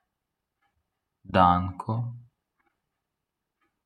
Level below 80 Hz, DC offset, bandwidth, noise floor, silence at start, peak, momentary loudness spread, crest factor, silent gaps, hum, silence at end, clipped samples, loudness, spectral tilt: -62 dBFS; under 0.1%; 10 kHz; -84 dBFS; 1.3 s; -6 dBFS; 12 LU; 24 dB; none; none; 1.65 s; under 0.1%; -25 LUFS; -8.5 dB/octave